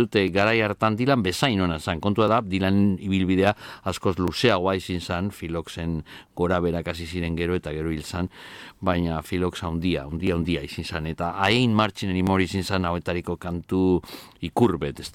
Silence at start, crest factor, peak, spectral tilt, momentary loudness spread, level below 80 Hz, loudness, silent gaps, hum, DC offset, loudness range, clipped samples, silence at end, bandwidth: 0 s; 18 dB; -4 dBFS; -6 dB/octave; 10 LU; -44 dBFS; -24 LUFS; none; none; under 0.1%; 5 LU; under 0.1%; 0.05 s; 16 kHz